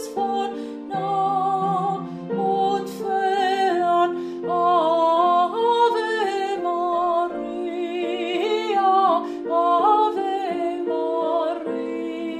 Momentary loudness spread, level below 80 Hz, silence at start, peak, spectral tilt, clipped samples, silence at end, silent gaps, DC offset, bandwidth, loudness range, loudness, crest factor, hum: 9 LU; -66 dBFS; 0 s; -6 dBFS; -5.5 dB/octave; under 0.1%; 0 s; none; under 0.1%; 14.5 kHz; 3 LU; -22 LUFS; 14 dB; none